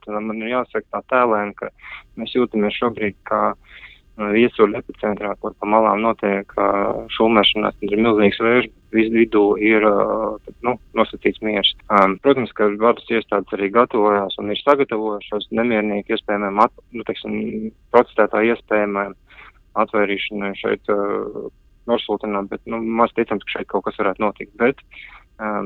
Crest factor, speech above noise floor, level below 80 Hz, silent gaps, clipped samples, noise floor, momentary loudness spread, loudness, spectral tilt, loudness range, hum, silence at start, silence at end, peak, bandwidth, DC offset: 20 dB; 27 dB; -50 dBFS; none; under 0.1%; -46 dBFS; 11 LU; -19 LUFS; -7.5 dB/octave; 5 LU; none; 0.05 s; 0 s; 0 dBFS; 5.6 kHz; under 0.1%